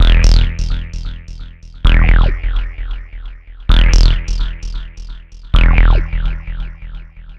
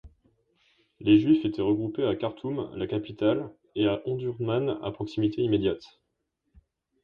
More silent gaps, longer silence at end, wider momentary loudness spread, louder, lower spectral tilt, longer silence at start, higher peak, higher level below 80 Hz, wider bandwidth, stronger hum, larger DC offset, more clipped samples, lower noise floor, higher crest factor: neither; second, 0.05 s vs 1.2 s; first, 22 LU vs 11 LU; first, -16 LUFS vs -27 LUFS; second, -5 dB/octave vs -9 dB/octave; about the same, 0 s vs 0.05 s; first, 0 dBFS vs -8 dBFS; first, -12 dBFS vs -58 dBFS; first, 7 kHz vs 5.6 kHz; neither; neither; neither; second, -31 dBFS vs -79 dBFS; second, 12 dB vs 20 dB